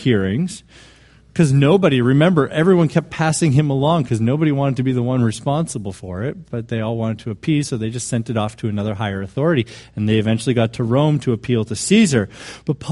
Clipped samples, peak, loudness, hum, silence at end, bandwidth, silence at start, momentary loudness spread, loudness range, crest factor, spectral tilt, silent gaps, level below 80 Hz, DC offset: under 0.1%; -2 dBFS; -18 LUFS; none; 0 s; 11.5 kHz; 0 s; 11 LU; 7 LU; 16 dB; -6.5 dB/octave; none; -48 dBFS; under 0.1%